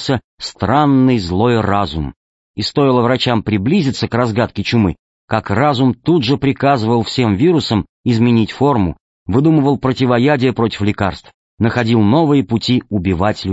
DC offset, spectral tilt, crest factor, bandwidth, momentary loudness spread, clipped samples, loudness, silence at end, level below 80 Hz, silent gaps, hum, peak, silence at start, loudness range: under 0.1%; -7 dB/octave; 14 dB; 8 kHz; 8 LU; under 0.1%; -15 LUFS; 0 s; -40 dBFS; 0.24-0.38 s, 2.16-2.54 s, 4.99-5.28 s, 7.89-8.03 s, 9.00-9.26 s, 11.34-11.57 s; none; -2 dBFS; 0 s; 1 LU